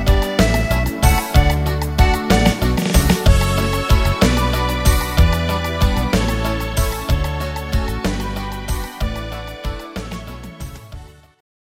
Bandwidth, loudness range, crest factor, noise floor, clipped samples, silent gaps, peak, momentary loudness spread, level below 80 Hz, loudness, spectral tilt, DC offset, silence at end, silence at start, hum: 16.5 kHz; 10 LU; 16 dB; -37 dBFS; under 0.1%; none; -2 dBFS; 14 LU; -20 dBFS; -18 LUFS; -5 dB/octave; under 0.1%; 0.55 s; 0 s; none